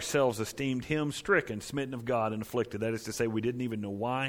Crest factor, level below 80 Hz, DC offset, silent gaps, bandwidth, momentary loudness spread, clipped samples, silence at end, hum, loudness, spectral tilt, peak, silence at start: 18 dB; -60 dBFS; under 0.1%; none; 19.5 kHz; 7 LU; under 0.1%; 0 s; none; -32 LUFS; -5 dB/octave; -12 dBFS; 0 s